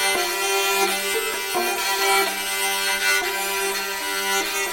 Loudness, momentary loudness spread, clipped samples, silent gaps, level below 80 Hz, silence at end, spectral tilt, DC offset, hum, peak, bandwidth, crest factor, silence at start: -21 LUFS; 4 LU; under 0.1%; none; -56 dBFS; 0 s; 0.5 dB/octave; under 0.1%; none; -6 dBFS; 17 kHz; 16 dB; 0 s